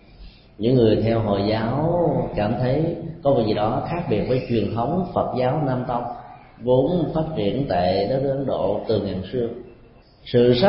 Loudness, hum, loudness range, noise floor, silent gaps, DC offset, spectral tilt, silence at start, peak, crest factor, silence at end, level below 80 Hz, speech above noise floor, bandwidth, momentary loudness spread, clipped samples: -22 LUFS; none; 2 LU; -49 dBFS; none; under 0.1%; -12 dB/octave; 0.2 s; -6 dBFS; 16 dB; 0 s; -44 dBFS; 29 dB; 5.8 kHz; 8 LU; under 0.1%